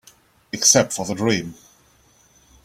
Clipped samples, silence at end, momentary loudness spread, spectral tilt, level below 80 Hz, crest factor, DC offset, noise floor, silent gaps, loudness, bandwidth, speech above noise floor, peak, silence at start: under 0.1%; 1.1 s; 18 LU; -2.5 dB/octave; -58 dBFS; 22 dB; under 0.1%; -56 dBFS; none; -18 LUFS; 16.5 kHz; 37 dB; 0 dBFS; 0.55 s